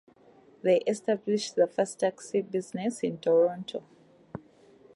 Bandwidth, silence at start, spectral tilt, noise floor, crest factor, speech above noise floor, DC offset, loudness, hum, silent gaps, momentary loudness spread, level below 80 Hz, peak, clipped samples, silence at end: 11.5 kHz; 0.65 s; -5 dB/octave; -58 dBFS; 18 dB; 30 dB; under 0.1%; -28 LUFS; none; none; 17 LU; -74 dBFS; -12 dBFS; under 0.1%; 0.55 s